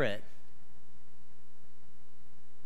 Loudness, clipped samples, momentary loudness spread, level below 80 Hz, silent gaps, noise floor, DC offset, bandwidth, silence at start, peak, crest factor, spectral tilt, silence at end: -38 LUFS; under 0.1%; 19 LU; -70 dBFS; none; -65 dBFS; 4%; 15.5 kHz; 0 s; -20 dBFS; 26 dB; -6 dB/octave; 2.45 s